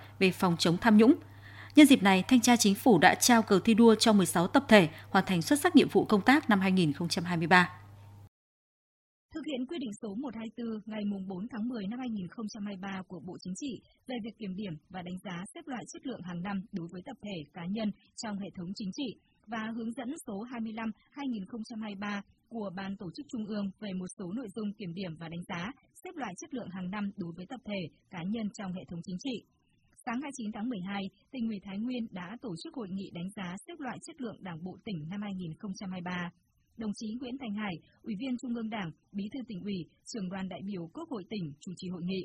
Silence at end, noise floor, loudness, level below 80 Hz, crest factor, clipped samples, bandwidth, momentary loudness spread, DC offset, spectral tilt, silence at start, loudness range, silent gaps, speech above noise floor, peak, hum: 0 s; -51 dBFS; -30 LUFS; -66 dBFS; 24 dB; under 0.1%; 16 kHz; 18 LU; under 0.1%; -4.5 dB/octave; 0 s; 17 LU; 8.28-9.29 s, 24.13-24.17 s; 21 dB; -6 dBFS; none